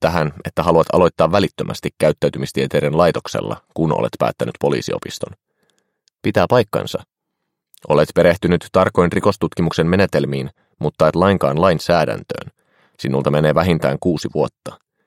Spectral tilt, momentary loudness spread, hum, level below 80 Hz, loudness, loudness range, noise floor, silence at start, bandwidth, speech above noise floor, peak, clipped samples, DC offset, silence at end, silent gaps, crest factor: -6.5 dB/octave; 11 LU; none; -46 dBFS; -17 LUFS; 5 LU; -77 dBFS; 0 s; 16 kHz; 60 dB; 0 dBFS; under 0.1%; under 0.1%; 0.3 s; none; 18 dB